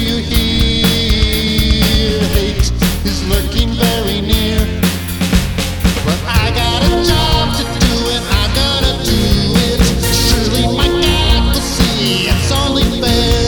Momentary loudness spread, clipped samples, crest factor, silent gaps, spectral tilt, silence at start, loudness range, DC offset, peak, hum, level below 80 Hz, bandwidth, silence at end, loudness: 4 LU; under 0.1%; 12 dB; none; -4.5 dB/octave; 0 s; 2 LU; under 0.1%; 0 dBFS; none; -18 dBFS; 19.5 kHz; 0 s; -13 LUFS